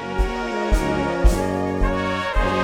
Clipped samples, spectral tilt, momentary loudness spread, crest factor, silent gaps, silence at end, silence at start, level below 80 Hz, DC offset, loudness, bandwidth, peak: under 0.1%; -6 dB/octave; 4 LU; 18 dB; none; 0 s; 0 s; -24 dBFS; under 0.1%; -22 LUFS; 14.5 kHz; -2 dBFS